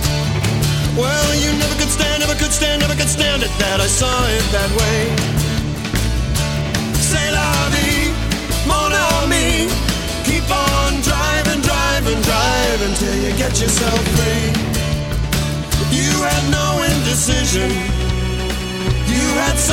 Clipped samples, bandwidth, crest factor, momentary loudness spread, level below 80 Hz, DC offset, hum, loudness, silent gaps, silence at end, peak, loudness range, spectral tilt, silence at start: under 0.1%; 17 kHz; 14 dB; 5 LU; -24 dBFS; under 0.1%; none; -16 LUFS; none; 0 s; -2 dBFS; 2 LU; -3.5 dB/octave; 0 s